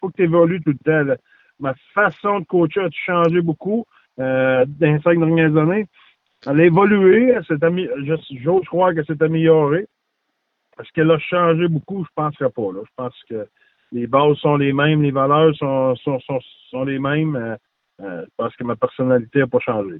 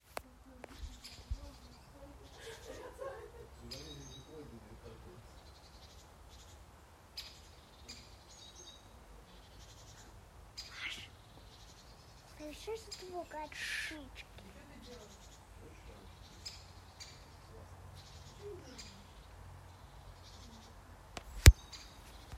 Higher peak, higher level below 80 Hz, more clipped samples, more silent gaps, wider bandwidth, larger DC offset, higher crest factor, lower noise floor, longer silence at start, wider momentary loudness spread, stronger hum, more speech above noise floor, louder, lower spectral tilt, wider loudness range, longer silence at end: about the same, -2 dBFS vs -2 dBFS; second, -60 dBFS vs -44 dBFS; neither; neither; second, 4.4 kHz vs 16 kHz; neither; second, 16 dB vs 38 dB; first, -73 dBFS vs -59 dBFS; about the same, 0 s vs 0.1 s; about the same, 14 LU vs 14 LU; neither; first, 56 dB vs 14 dB; first, -18 LUFS vs -38 LUFS; first, -10.5 dB/octave vs -4 dB/octave; second, 5 LU vs 9 LU; about the same, 0 s vs 0 s